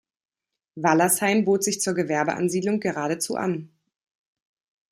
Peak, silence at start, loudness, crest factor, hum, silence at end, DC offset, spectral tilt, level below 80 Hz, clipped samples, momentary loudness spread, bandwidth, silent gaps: -4 dBFS; 0.75 s; -23 LUFS; 20 dB; none; 1.25 s; under 0.1%; -4 dB/octave; -70 dBFS; under 0.1%; 7 LU; 15.5 kHz; none